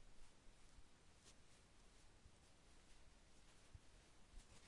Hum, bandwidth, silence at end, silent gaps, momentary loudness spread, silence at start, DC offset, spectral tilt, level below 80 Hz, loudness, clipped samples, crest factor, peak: none; 11 kHz; 0 s; none; 1 LU; 0 s; under 0.1%; -3.5 dB/octave; -70 dBFS; -69 LUFS; under 0.1%; 16 dB; -48 dBFS